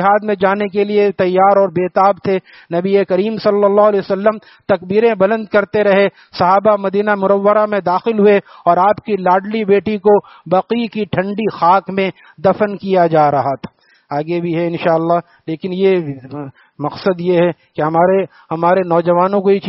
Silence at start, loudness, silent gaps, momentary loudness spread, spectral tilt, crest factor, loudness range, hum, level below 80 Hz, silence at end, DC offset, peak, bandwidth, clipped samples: 0 s; -14 LUFS; none; 9 LU; -5.5 dB/octave; 14 dB; 4 LU; none; -58 dBFS; 0 s; under 0.1%; 0 dBFS; 5.8 kHz; under 0.1%